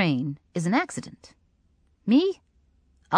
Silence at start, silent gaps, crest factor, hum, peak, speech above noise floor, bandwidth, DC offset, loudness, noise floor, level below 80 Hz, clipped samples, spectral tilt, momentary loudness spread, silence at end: 0 s; none; 22 dB; none; -6 dBFS; 40 dB; 10.5 kHz; under 0.1%; -26 LUFS; -65 dBFS; -66 dBFS; under 0.1%; -6 dB/octave; 17 LU; 0 s